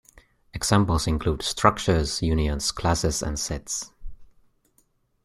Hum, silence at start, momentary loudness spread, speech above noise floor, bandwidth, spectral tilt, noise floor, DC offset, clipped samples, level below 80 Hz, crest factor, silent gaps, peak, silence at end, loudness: none; 0.55 s; 9 LU; 43 dB; 14 kHz; -4.5 dB/octave; -66 dBFS; under 0.1%; under 0.1%; -36 dBFS; 22 dB; none; -2 dBFS; 1 s; -24 LUFS